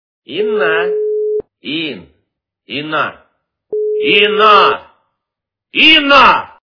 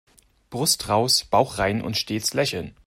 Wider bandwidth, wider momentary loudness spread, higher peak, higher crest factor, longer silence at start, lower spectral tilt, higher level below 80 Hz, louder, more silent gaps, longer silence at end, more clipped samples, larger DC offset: second, 5.4 kHz vs 16 kHz; first, 17 LU vs 6 LU; first, 0 dBFS vs -4 dBFS; second, 14 dB vs 20 dB; second, 0.3 s vs 0.5 s; first, -4.5 dB/octave vs -3 dB/octave; about the same, -50 dBFS vs -50 dBFS; first, -11 LUFS vs -22 LUFS; neither; about the same, 0.2 s vs 0.15 s; first, 0.5% vs under 0.1%; neither